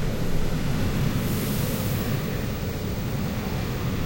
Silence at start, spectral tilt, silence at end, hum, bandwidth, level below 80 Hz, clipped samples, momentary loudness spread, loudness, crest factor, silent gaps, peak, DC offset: 0 s; -6 dB/octave; 0 s; none; 16.5 kHz; -32 dBFS; under 0.1%; 4 LU; -27 LUFS; 14 dB; none; -12 dBFS; under 0.1%